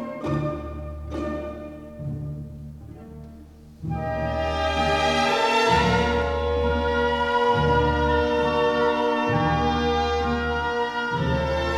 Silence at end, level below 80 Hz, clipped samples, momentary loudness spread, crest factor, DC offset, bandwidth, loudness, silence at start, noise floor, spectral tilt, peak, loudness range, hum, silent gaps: 0 s; -36 dBFS; under 0.1%; 16 LU; 16 dB; under 0.1%; 13 kHz; -23 LUFS; 0 s; -45 dBFS; -5.5 dB/octave; -8 dBFS; 12 LU; none; none